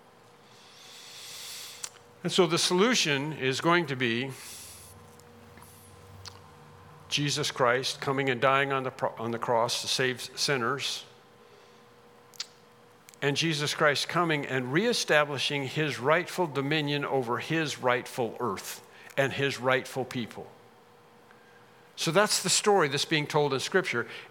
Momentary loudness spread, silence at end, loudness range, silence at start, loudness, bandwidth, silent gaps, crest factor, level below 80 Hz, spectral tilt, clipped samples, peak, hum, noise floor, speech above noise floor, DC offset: 17 LU; 0 s; 6 LU; 0.75 s; -27 LUFS; 18 kHz; none; 24 dB; -76 dBFS; -3.5 dB/octave; under 0.1%; -6 dBFS; none; -57 dBFS; 29 dB; under 0.1%